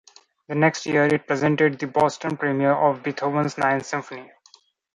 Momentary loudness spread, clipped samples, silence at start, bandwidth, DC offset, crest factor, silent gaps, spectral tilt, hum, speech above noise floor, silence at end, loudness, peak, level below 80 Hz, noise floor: 10 LU; under 0.1%; 0.5 s; 11 kHz; under 0.1%; 18 dB; none; -6 dB/octave; none; 35 dB; 0.7 s; -22 LUFS; -4 dBFS; -64 dBFS; -56 dBFS